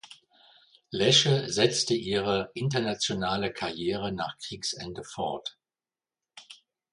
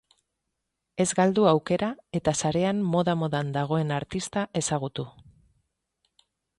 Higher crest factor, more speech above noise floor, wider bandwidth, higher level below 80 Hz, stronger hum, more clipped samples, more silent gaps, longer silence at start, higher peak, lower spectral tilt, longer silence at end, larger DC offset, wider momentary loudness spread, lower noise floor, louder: about the same, 22 dB vs 20 dB; first, over 62 dB vs 56 dB; about the same, 11.5 kHz vs 11.5 kHz; about the same, -60 dBFS vs -58 dBFS; neither; neither; neither; second, 0.05 s vs 0.95 s; about the same, -8 dBFS vs -8 dBFS; second, -4 dB/octave vs -5.5 dB/octave; second, 0.4 s vs 1.5 s; neither; first, 16 LU vs 8 LU; first, under -90 dBFS vs -82 dBFS; about the same, -27 LUFS vs -26 LUFS